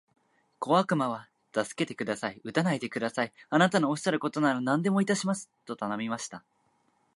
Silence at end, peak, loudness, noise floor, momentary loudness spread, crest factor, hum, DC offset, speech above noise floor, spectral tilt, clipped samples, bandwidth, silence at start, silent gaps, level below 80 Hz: 0.75 s; -8 dBFS; -29 LUFS; -70 dBFS; 11 LU; 22 dB; none; under 0.1%; 42 dB; -5 dB/octave; under 0.1%; 11.5 kHz; 0.6 s; none; -76 dBFS